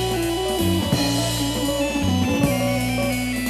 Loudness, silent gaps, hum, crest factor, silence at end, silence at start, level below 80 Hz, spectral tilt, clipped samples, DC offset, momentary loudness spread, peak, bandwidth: -21 LUFS; none; none; 14 dB; 0 s; 0 s; -36 dBFS; -4.5 dB/octave; under 0.1%; under 0.1%; 2 LU; -6 dBFS; 14 kHz